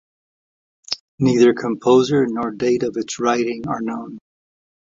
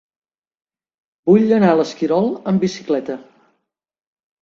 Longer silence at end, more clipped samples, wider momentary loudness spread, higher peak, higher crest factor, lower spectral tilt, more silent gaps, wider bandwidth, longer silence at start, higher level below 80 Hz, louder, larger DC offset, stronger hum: second, 0.75 s vs 1.2 s; neither; about the same, 13 LU vs 11 LU; about the same, -2 dBFS vs -2 dBFS; about the same, 18 dB vs 18 dB; second, -5.5 dB/octave vs -7 dB/octave; first, 1.00-1.18 s vs none; about the same, 7.8 kHz vs 7.6 kHz; second, 0.9 s vs 1.25 s; about the same, -58 dBFS vs -62 dBFS; about the same, -19 LUFS vs -17 LUFS; neither; neither